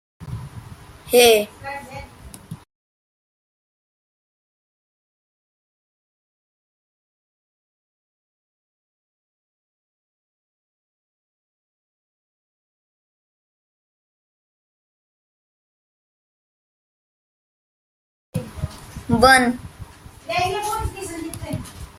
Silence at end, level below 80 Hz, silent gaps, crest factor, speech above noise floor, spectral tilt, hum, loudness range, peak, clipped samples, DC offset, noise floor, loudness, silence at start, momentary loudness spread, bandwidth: 0.1 s; -46 dBFS; 2.75-18.33 s; 26 dB; 26 dB; -3.5 dB/octave; none; 18 LU; 0 dBFS; under 0.1%; under 0.1%; -41 dBFS; -18 LUFS; 0.2 s; 26 LU; 16 kHz